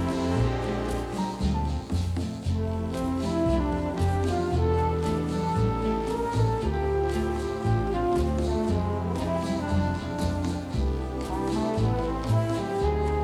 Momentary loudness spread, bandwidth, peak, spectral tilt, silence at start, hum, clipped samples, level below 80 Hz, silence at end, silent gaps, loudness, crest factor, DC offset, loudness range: 4 LU; 13 kHz; -12 dBFS; -7.5 dB/octave; 0 s; none; under 0.1%; -34 dBFS; 0 s; none; -27 LUFS; 14 dB; under 0.1%; 2 LU